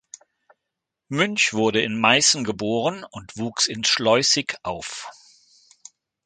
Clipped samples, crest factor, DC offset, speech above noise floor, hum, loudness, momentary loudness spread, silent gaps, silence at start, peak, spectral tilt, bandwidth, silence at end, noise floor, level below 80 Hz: under 0.1%; 22 dB; under 0.1%; 61 dB; none; -20 LUFS; 16 LU; none; 1.1 s; -2 dBFS; -2.5 dB/octave; 9.6 kHz; 1.15 s; -83 dBFS; -60 dBFS